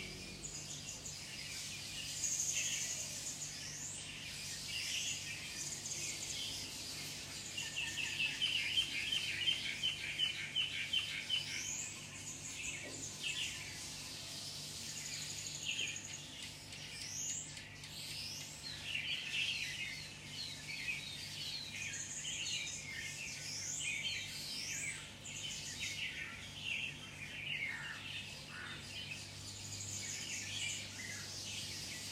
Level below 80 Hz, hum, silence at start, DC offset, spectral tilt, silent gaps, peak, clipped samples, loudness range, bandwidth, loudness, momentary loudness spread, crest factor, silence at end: -66 dBFS; none; 0 s; under 0.1%; -0.5 dB/octave; none; -22 dBFS; under 0.1%; 7 LU; 16 kHz; -40 LUFS; 10 LU; 20 dB; 0 s